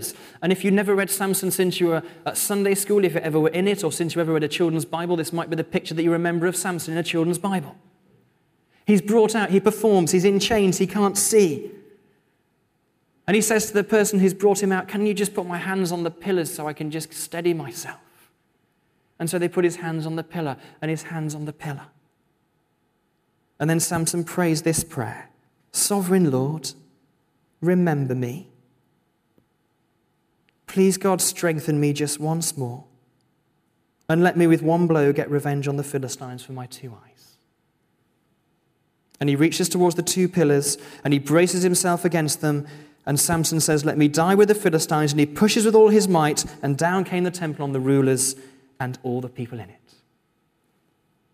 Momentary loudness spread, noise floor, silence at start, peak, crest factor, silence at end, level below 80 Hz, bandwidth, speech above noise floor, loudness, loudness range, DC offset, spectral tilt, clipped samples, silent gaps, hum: 13 LU; -69 dBFS; 0 s; -4 dBFS; 18 dB; 1.65 s; -60 dBFS; 16 kHz; 47 dB; -21 LUFS; 9 LU; under 0.1%; -5 dB/octave; under 0.1%; none; none